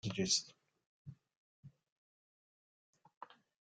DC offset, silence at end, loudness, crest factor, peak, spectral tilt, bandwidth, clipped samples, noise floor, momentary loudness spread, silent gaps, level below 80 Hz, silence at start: under 0.1%; 0.35 s; -35 LUFS; 24 dB; -20 dBFS; -2.5 dB/octave; 11 kHz; under 0.1%; under -90 dBFS; 25 LU; 0.86-1.05 s, 1.37-1.63 s, 1.92-2.93 s, 3.17-3.21 s; -76 dBFS; 0.05 s